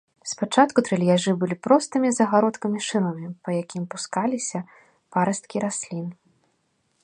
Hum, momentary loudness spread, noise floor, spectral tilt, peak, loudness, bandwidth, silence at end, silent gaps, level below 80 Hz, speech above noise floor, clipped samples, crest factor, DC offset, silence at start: none; 13 LU; -70 dBFS; -5 dB/octave; -2 dBFS; -23 LUFS; 10.5 kHz; 0.9 s; none; -72 dBFS; 47 dB; under 0.1%; 22 dB; under 0.1%; 0.25 s